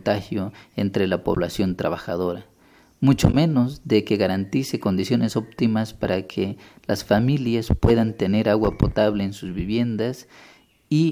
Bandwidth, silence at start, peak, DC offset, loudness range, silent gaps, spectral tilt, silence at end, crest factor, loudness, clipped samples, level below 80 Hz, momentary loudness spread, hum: 16 kHz; 0.05 s; 0 dBFS; under 0.1%; 2 LU; none; -7 dB/octave; 0 s; 22 dB; -22 LUFS; under 0.1%; -38 dBFS; 9 LU; none